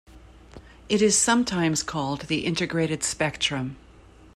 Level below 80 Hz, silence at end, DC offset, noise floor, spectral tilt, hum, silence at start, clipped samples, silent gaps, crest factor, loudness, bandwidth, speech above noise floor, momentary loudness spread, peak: -52 dBFS; 0.6 s; under 0.1%; -50 dBFS; -3.5 dB/octave; none; 0.15 s; under 0.1%; none; 18 dB; -24 LUFS; 15 kHz; 26 dB; 9 LU; -8 dBFS